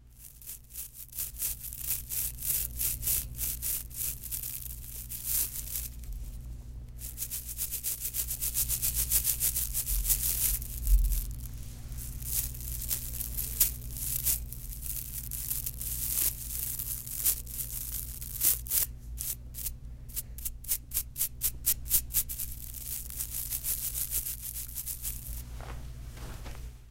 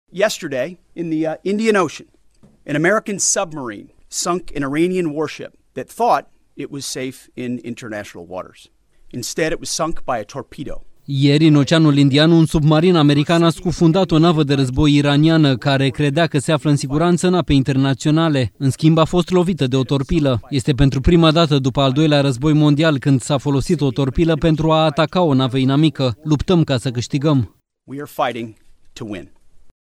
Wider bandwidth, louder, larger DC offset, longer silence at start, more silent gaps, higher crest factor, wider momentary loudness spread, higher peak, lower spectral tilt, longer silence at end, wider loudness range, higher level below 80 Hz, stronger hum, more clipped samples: first, 17 kHz vs 14 kHz; second, -31 LUFS vs -16 LUFS; neither; second, 0 s vs 0.15 s; neither; first, 26 dB vs 16 dB; about the same, 17 LU vs 17 LU; second, -6 dBFS vs 0 dBFS; second, -1.5 dB/octave vs -5.5 dB/octave; second, 0 s vs 0.15 s; second, 6 LU vs 10 LU; about the same, -40 dBFS vs -36 dBFS; first, 60 Hz at -50 dBFS vs none; neither